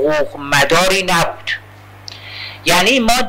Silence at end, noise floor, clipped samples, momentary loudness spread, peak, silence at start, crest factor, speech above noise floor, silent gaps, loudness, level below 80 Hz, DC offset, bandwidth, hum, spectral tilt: 0 s; -36 dBFS; under 0.1%; 19 LU; -2 dBFS; 0 s; 14 dB; 22 dB; none; -14 LUFS; -38 dBFS; under 0.1%; 16.5 kHz; 50 Hz at -40 dBFS; -3 dB/octave